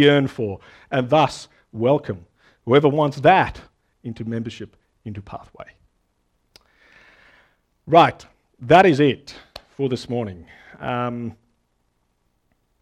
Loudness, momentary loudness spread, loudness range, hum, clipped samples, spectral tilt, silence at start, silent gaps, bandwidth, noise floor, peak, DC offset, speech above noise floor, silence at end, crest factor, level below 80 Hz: -19 LUFS; 23 LU; 16 LU; none; under 0.1%; -6.5 dB/octave; 0 s; none; 11.5 kHz; -68 dBFS; 0 dBFS; under 0.1%; 49 dB; 1.5 s; 22 dB; -54 dBFS